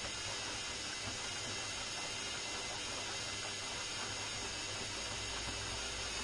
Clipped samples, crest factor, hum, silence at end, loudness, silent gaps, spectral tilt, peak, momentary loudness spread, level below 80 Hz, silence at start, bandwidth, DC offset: under 0.1%; 14 dB; none; 0 s; -39 LUFS; none; -1 dB/octave; -28 dBFS; 0 LU; -58 dBFS; 0 s; 11.5 kHz; under 0.1%